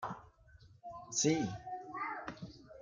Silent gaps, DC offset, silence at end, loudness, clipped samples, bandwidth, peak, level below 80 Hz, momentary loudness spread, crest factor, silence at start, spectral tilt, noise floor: none; under 0.1%; 0 s; -37 LUFS; under 0.1%; 10 kHz; -18 dBFS; -66 dBFS; 19 LU; 22 dB; 0 s; -3.5 dB/octave; -61 dBFS